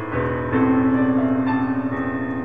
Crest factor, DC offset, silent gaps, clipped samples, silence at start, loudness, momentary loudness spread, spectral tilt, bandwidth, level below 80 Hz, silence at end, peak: 12 dB; 0.7%; none; under 0.1%; 0 s; -20 LUFS; 6 LU; -10 dB/octave; 4.7 kHz; -48 dBFS; 0 s; -8 dBFS